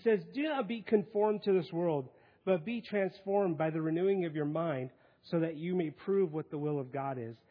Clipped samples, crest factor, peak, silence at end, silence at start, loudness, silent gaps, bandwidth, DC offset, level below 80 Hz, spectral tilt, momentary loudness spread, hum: under 0.1%; 18 dB; -14 dBFS; 0.15 s; 0 s; -34 LUFS; none; 5.2 kHz; under 0.1%; -82 dBFS; -6.5 dB/octave; 7 LU; none